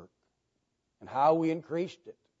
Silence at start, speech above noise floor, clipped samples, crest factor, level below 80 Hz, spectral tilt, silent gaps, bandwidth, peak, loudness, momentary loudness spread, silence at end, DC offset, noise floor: 0 s; 51 dB; under 0.1%; 18 dB; -84 dBFS; -7.5 dB/octave; none; 7.8 kHz; -14 dBFS; -30 LUFS; 12 LU; 0.3 s; under 0.1%; -80 dBFS